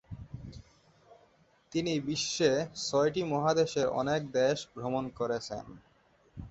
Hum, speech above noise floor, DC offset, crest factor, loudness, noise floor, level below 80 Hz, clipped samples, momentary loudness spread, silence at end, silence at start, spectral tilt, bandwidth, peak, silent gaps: none; 35 dB; under 0.1%; 20 dB; -31 LUFS; -66 dBFS; -60 dBFS; under 0.1%; 18 LU; 0 s; 0.1 s; -4.5 dB/octave; 8.2 kHz; -12 dBFS; none